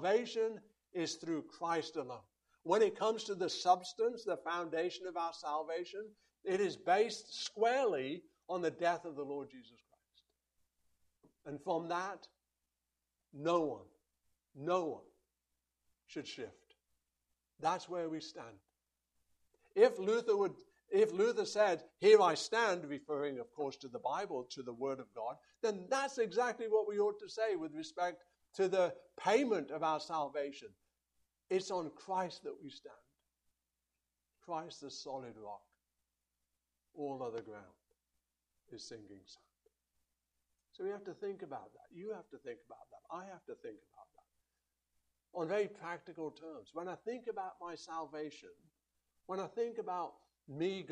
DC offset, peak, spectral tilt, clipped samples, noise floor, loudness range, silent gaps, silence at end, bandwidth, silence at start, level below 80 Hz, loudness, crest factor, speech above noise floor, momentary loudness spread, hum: under 0.1%; -14 dBFS; -4 dB/octave; under 0.1%; -89 dBFS; 16 LU; none; 0 s; 11 kHz; 0 s; -84 dBFS; -37 LUFS; 24 dB; 52 dB; 18 LU; 60 Hz at -80 dBFS